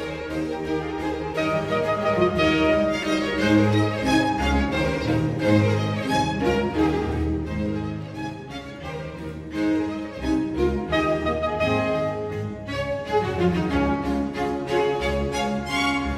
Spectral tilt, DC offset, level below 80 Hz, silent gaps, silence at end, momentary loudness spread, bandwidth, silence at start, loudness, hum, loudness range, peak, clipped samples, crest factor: -6.5 dB/octave; under 0.1%; -38 dBFS; none; 0 s; 10 LU; 14 kHz; 0 s; -23 LUFS; none; 6 LU; -6 dBFS; under 0.1%; 18 dB